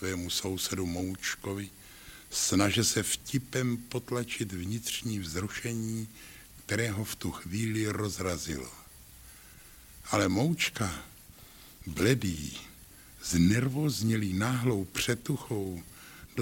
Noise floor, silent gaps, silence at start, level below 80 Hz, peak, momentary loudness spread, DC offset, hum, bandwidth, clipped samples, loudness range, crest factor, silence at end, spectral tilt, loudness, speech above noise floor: -53 dBFS; none; 0 s; -54 dBFS; -10 dBFS; 23 LU; under 0.1%; none; 17 kHz; under 0.1%; 5 LU; 22 dB; 0 s; -4.5 dB/octave; -31 LUFS; 22 dB